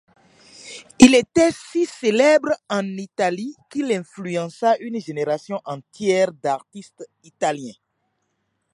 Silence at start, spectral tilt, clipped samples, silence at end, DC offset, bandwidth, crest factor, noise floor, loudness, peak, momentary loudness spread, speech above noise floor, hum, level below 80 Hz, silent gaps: 0.65 s; -4.5 dB/octave; under 0.1%; 1 s; under 0.1%; 11.5 kHz; 22 dB; -72 dBFS; -20 LUFS; 0 dBFS; 17 LU; 52 dB; none; -56 dBFS; none